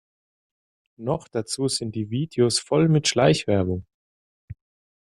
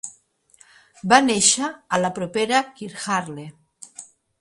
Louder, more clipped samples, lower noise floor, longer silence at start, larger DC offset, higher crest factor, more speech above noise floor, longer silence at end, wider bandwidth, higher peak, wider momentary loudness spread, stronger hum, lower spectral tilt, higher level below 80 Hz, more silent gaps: second, -23 LUFS vs -20 LUFS; neither; first, under -90 dBFS vs -57 dBFS; first, 1 s vs 0.05 s; neither; about the same, 20 dB vs 22 dB; first, over 68 dB vs 37 dB; about the same, 0.45 s vs 0.35 s; about the same, 12.5 kHz vs 11.5 kHz; second, -6 dBFS vs 0 dBFS; second, 10 LU vs 23 LU; neither; first, -5 dB/octave vs -2.5 dB/octave; first, -56 dBFS vs -64 dBFS; first, 3.94-4.48 s vs none